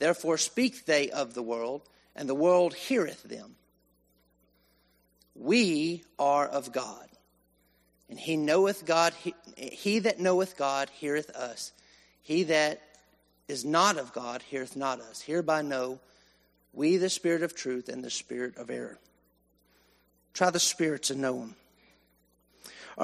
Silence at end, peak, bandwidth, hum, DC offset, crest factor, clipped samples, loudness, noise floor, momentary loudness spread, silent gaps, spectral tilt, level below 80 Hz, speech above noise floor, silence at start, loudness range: 0 s; -10 dBFS; 13.5 kHz; none; under 0.1%; 22 dB; under 0.1%; -29 LUFS; -69 dBFS; 17 LU; none; -3.5 dB/octave; -74 dBFS; 40 dB; 0 s; 4 LU